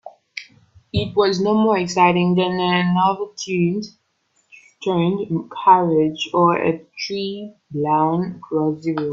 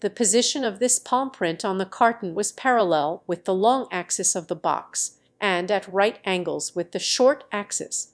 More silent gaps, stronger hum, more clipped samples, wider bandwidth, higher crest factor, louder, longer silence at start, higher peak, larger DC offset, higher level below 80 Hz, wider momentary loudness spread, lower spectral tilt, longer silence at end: neither; neither; neither; second, 7.6 kHz vs 11 kHz; about the same, 18 dB vs 20 dB; first, -19 LUFS vs -23 LUFS; about the same, 0.05 s vs 0 s; first, 0 dBFS vs -4 dBFS; neither; first, -54 dBFS vs -74 dBFS; first, 13 LU vs 8 LU; first, -6 dB/octave vs -2.5 dB/octave; about the same, 0 s vs 0.1 s